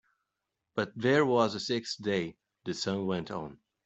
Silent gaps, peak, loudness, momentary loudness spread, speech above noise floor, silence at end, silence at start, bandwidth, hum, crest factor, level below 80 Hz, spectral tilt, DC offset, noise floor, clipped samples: none; -12 dBFS; -31 LUFS; 15 LU; 56 dB; 0.3 s; 0.75 s; 8.2 kHz; none; 20 dB; -70 dBFS; -5 dB/octave; under 0.1%; -86 dBFS; under 0.1%